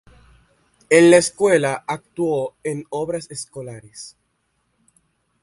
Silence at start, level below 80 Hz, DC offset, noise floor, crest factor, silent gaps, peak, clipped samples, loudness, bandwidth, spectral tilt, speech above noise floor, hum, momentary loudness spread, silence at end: 0.9 s; -60 dBFS; under 0.1%; -69 dBFS; 20 dB; none; 0 dBFS; under 0.1%; -18 LUFS; 11.5 kHz; -4.5 dB/octave; 50 dB; none; 23 LU; 1.35 s